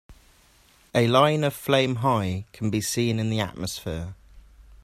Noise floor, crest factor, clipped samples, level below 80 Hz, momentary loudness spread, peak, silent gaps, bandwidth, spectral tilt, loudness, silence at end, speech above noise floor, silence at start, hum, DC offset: -58 dBFS; 20 dB; under 0.1%; -52 dBFS; 13 LU; -4 dBFS; none; 16 kHz; -5 dB/octave; -24 LUFS; 0.45 s; 34 dB; 0.1 s; none; under 0.1%